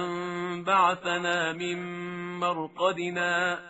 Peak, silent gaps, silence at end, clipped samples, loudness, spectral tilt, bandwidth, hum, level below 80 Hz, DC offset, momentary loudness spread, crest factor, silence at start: -12 dBFS; none; 0 s; under 0.1%; -28 LUFS; -2.5 dB/octave; 8 kHz; none; -72 dBFS; under 0.1%; 11 LU; 18 dB; 0 s